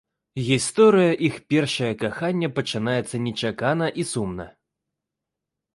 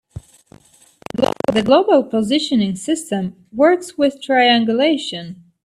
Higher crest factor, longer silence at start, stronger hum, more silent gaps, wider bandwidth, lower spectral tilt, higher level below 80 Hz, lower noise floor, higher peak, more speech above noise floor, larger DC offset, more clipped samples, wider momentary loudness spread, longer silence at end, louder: about the same, 18 dB vs 16 dB; first, 0.35 s vs 0.15 s; neither; neither; second, 11.5 kHz vs 13.5 kHz; about the same, -5 dB/octave vs -4.5 dB/octave; about the same, -56 dBFS vs -54 dBFS; first, -85 dBFS vs -50 dBFS; second, -6 dBFS vs -2 dBFS; first, 63 dB vs 33 dB; neither; neither; about the same, 13 LU vs 13 LU; first, 1.25 s vs 0.3 s; second, -22 LUFS vs -17 LUFS